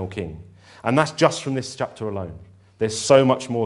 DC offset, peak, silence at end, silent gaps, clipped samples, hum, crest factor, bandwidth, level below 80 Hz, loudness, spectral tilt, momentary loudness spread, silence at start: under 0.1%; 0 dBFS; 0 s; none; under 0.1%; none; 22 dB; 11.5 kHz; -52 dBFS; -21 LUFS; -5 dB/octave; 16 LU; 0 s